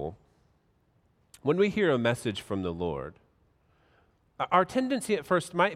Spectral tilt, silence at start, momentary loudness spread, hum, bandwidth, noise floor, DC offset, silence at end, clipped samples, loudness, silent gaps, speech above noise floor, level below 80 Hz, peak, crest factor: -5.5 dB/octave; 0 s; 11 LU; none; 15.5 kHz; -68 dBFS; under 0.1%; 0 s; under 0.1%; -28 LUFS; none; 41 dB; -62 dBFS; -8 dBFS; 22 dB